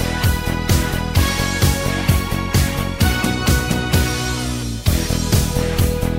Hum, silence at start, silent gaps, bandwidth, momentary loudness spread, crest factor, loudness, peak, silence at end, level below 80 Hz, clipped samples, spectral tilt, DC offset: none; 0 s; none; 16.5 kHz; 3 LU; 16 dB; -18 LUFS; -2 dBFS; 0 s; -24 dBFS; under 0.1%; -4.5 dB/octave; under 0.1%